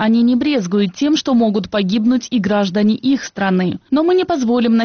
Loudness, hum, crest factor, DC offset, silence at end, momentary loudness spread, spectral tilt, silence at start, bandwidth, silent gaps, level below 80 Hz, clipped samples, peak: -16 LUFS; none; 10 dB; under 0.1%; 0 s; 4 LU; -5 dB/octave; 0 s; 6.8 kHz; none; -52 dBFS; under 0.1%; -6 dBFS